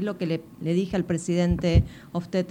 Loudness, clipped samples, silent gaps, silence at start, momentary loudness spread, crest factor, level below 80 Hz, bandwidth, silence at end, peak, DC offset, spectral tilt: -26 LUFS; under 0.1%; none; 0 s; 8 LU; 18 dB; -34 dBFS; 10.5 kHz; 0 s; -6 dBFS; under 0.1%; -7 dB/octave